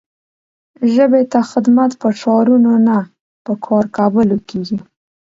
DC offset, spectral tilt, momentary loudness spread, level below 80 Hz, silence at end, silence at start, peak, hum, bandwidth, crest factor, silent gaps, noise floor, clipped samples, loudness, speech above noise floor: under 0.1%; -7.5 dB/octave; 13 LU; -56 dBFS; 0.5 s; 0.8 s; 0 dBFS; none; 7.6 kHz; 14 dB; 3.21-3.45 s; under -90 dBFS; under 0.1%; -14 LUFS; over 77 dB